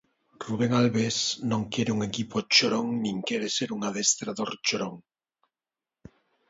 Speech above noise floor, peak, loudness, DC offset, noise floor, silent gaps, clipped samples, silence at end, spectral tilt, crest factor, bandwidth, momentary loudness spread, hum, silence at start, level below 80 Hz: over 63 dB; -6 dBFS; -26 LUFS; under 0.1%; under -90 dBFS; none; under 0.1%; 1.5 s; -3.5 dB/octave; 22 dB; 8 kHz; 10 LU; none; 0.4 s; -64 dBFS